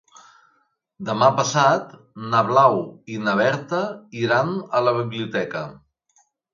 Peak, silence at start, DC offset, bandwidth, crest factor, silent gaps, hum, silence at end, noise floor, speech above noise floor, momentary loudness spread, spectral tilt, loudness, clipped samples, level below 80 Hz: -2 dBFS; 1 s; under 0.1%; 7.4 kHz; 20 dB; none; none; 0.8 s; -66 dBFS; 46 dB; 15 LU; -5 dB/octave; -21 LUFS; under 0.1%; -66 dBFS